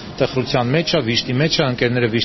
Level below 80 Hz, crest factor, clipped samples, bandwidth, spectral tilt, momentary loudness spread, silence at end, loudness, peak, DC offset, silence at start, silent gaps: -44 dBFS; 16 dB; under 0.1%; 6.2 kHz; -4 dB/octave; 2 LU; 0 s; -18 LUFS; -2 dBFS; under 0.1%; 0 s; none